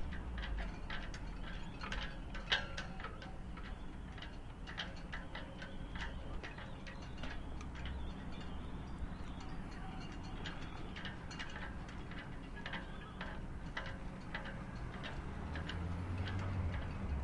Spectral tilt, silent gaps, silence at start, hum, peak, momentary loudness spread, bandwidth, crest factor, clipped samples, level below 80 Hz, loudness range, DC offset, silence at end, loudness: -5.5 dB/octave; none; 0 s; none; -20 dBFS; 8 LU; 11 kHz; 24 dB; under 0.1%; -48 dBFS; 4 LU; under 0.1%; 0 s; -46 LUFS